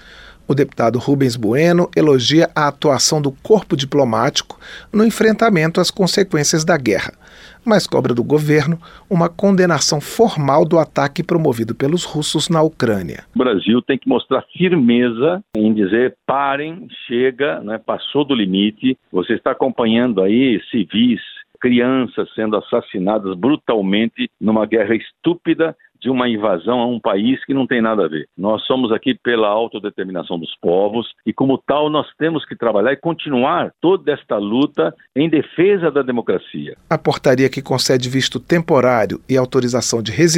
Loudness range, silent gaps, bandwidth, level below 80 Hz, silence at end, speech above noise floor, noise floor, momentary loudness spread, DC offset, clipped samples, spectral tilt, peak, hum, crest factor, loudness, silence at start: 3 LU; none; 16 kHz; -52 dBFS; 0 s; 20 dB; -36 dBFS; 8 LU; under 0.1%; under 0.1%; -5 dB/octave; 0 dBFS; none; 16 dB; -16 LUFS; 0.15 s